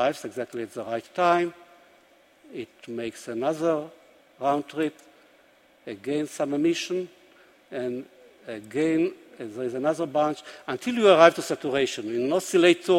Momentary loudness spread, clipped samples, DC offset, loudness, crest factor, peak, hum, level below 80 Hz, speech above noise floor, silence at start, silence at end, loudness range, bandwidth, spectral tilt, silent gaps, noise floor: 19 LU; under 0.1%; under 0.1%; -25 LUFS; 26 dB; 0 dBFS; none; -72 dBFS; 34 dB; 0 s; 0 s; 8 LU; 16 kHz; -4.5 dB/octave; none; -59 dBFS